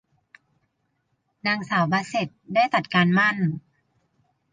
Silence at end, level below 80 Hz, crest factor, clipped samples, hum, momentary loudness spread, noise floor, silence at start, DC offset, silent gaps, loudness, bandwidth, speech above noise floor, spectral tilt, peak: 0.95 s; -68 dBFS; 18 dB; under 0.1%; none; 9 LU; -73 dBFS; 1.45 s; under 0.1%; none; -22 LUFS; 9.4 kHz; 51 dB; -6 dB/octave; -8 dBFS